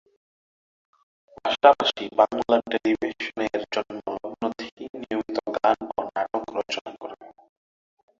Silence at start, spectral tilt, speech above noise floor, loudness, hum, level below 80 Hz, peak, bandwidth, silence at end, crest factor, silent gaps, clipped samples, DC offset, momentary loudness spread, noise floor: 1.45 s; -4 dB/octave; over 68 dB; -25 LUFS; none; -64 dBFS; -2 dBFS; 7.6 kHz; 0.9 s; 24 dB; 4.72-4.77 s, 4.89-4.93 s, 6.81-6.85 s; under 0.1%; under 0.1%; 17 LU; under -90 dBFS